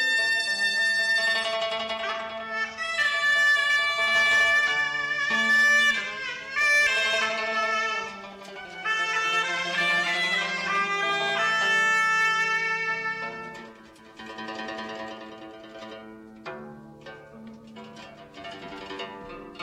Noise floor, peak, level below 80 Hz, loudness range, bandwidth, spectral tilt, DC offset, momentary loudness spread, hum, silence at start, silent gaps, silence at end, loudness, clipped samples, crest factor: -49 dBFS; -12 dBFS; -66 dBFS; 20 LU; 16 kHz; -1 dB/octave; under 0.1%; 23 LU; none; 0 s; none; 0 s; -23 LUFS; under 0.1%; 14 dB